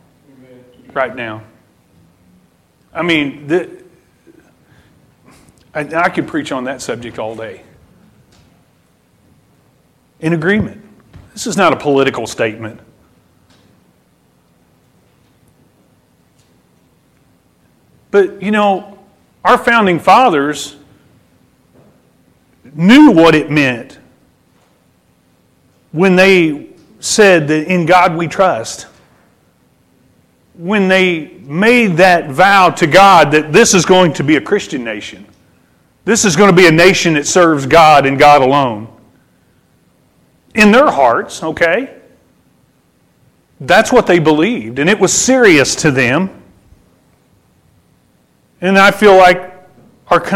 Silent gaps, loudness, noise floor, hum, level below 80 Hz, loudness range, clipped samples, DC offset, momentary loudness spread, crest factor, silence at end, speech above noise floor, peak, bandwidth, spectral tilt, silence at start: none; -10 LUFS; -54 dBFS; none; -46 dBFS; 13 LU; under 0.1%; under 0.1%; 18 LU; 14 dB; 0 s; 44 dB; 0 dBFS; 16.5 kHz; -4.5 dB/octave; 0.95 s